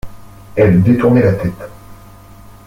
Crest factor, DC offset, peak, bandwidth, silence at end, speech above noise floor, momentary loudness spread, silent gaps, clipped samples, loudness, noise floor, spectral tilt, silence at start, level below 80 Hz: 14 dB; under 0.1%; -2 dBFS; 16 kHz; 0.7 s; 27 dB; 18 LU; none; under 0.1%; -13 LUFS; -38 dBFS; -9.5 dB/octave; 0.05 s; -38 dBFS